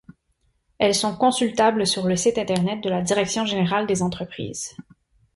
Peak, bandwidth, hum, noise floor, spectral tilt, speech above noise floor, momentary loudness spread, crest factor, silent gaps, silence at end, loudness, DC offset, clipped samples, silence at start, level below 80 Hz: -6 dBFS; 12 kHz; none; -68 dBFS; -4 dB/octave; 46 dB; 11 LU; 18 dB; none; 0.55 s; -22 LUFS; under 0.1%; under 0.1%; 0.8 s; -56 dBFS